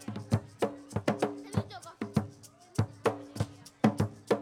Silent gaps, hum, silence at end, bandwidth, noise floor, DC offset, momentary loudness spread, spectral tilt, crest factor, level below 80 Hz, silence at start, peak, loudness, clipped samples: none; none; 0 s; 16 kHz; -53 dBFS; under 0.1%; 8 LU; -7 dB/octave; 22 dB; -58 dBFS; 0 s; -10 dBFS; -34 LUFS; under 0.1%